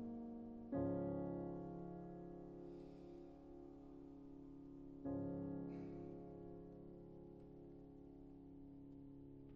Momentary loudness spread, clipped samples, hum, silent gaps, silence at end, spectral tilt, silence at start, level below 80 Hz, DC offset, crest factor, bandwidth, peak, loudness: 14 LU; under 0.1%; none; none; 0 s; -10.5 dB/octave; 0 s; -68 dBFS; under 0.1%; 18 dB; 5.4 kHz; -34 dBFS; -52 LUFS